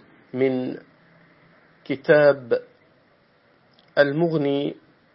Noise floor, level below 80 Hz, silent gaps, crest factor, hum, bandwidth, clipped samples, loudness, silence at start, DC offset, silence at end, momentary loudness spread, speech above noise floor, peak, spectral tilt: -59 dBFS; -72 dBFS; none; 22 dB; none; 5.8 kHz; under 0.1%; -22 LUFS; 0.35 s; under 0.1%; 0.4 s; 15 LU; 39 dB; -2 dBFS; -11 dB/octave